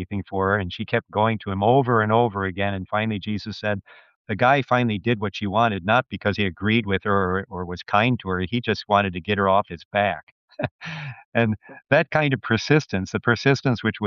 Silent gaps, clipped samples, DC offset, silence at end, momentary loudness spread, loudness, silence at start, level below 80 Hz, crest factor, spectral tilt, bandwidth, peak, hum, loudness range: 4.16-4.25 s, 9.85-9.91 s, 10.23-10.48 s, 10.71-10.79 s, 11.25-11.32 s; under 0.1%; under 0.1%; 0 s; 10 LU; -22 LUFS; 0 s; -58 dBFS; 18 dB; -4.5 dB/octave; 7.2 kHz; -4 dBFS; none; 2 LU